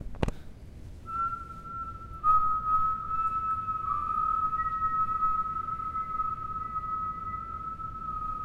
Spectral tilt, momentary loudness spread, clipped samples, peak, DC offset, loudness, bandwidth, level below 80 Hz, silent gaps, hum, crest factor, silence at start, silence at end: -7 dB/octave; 12 LU; under 0.1%; -8 dBFS; under 0.1%; -30 LUFS; 10 kHz; -46 dBFS; none; none; 24 dB; 0 s; 0 s